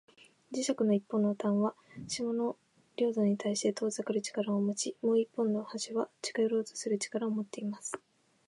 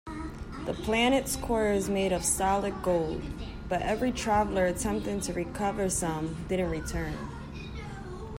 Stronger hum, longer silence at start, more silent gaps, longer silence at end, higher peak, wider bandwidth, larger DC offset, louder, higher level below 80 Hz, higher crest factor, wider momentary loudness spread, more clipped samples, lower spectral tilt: neither; first, 0.5 s vs 0.05 s; neither; first, 0.5 s vs 0 s; second, -18 dBFS vs -14 dBFS; second, 11.5 kHz vs 16 kHz; neither; second, -33 LUFS vs -29 LUFS; second, -80 dBFS vs -42 dBFS; about the same, 16 dB vs 16 dB; second, 9 LU vs 14 LU; neither; about the same, -5 dB/octave vs -4.5 dB/octave